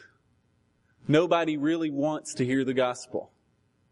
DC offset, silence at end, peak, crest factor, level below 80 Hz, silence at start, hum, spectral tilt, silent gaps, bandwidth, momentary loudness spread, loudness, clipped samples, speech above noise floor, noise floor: under 0.1%; 0.65 s; -10 dBFS; 18 dB; -72 dBFS; 1.05 s; none; -5.5 dB/octave; none; 11.5 kHz; 13 LU; -27 LUFS; under 0.1%; 43 dB; -69 dBFS